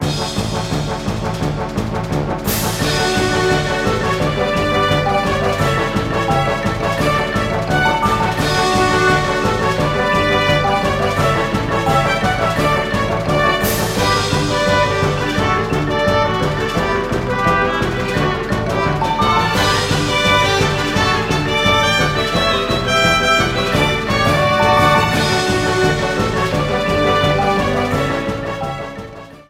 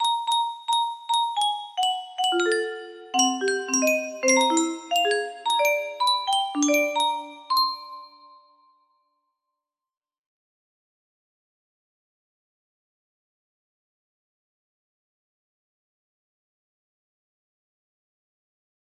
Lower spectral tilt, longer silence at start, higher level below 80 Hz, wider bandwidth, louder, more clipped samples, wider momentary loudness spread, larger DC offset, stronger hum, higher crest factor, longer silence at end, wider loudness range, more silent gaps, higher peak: first, -4.5 dB/octave vs 0.5 dB/octave; about the same, 0 s vs 0 s; first, -32 dBFS vs -80 dBFS; about the same, 17 kHz vs 16 kHz; first, -16 LUFS vs -23 LUFS; neither; about the same, 7 LU vs 5 LU; neither; neither; second, 14 dB vs 20 dB; second, 0.1 s vs 10.9 s; second, 3 LU vs 7 LU; neither; first, -2 dBFS vs -8 dBFS